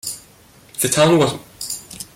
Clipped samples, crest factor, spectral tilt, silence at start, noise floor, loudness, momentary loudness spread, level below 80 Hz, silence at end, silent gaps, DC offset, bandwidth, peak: under 0.1%; 18 dB; -4 dB/octave; 0.05 s; -48 dBFS; -18 LUFS; 17 LU; -54 dBFS; 0.1 s; none; under 0.1%; 16.5 kHz; -2 dBFS